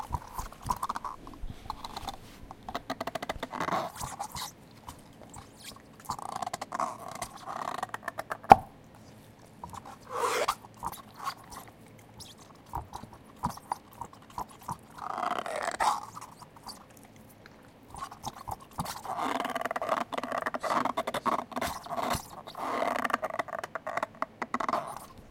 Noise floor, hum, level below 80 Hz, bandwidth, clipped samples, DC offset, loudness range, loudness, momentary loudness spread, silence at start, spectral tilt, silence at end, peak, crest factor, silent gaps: -54 dBFS; none; -54 dBFS; 17 kHz; under 0.1%; under 0.1%; 11 LU; -33 LUFS; 19 LU; 0 s; -4 dB/octave; 0 s; 0 dBFS; 34 dB; none